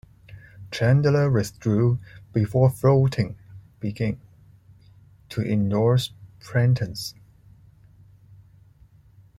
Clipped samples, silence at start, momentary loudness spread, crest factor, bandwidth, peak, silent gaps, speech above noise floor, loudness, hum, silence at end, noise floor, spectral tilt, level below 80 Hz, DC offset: under 0.1%; 0.3 s; 14 LU; 18 dB; 13.5 kHz; -8 dBFS; none; 32 dB; -23 LUFS; none; 2.25 s; -53 dBFS; -7.5 dB/octave; -52 dBFS; under 0.1%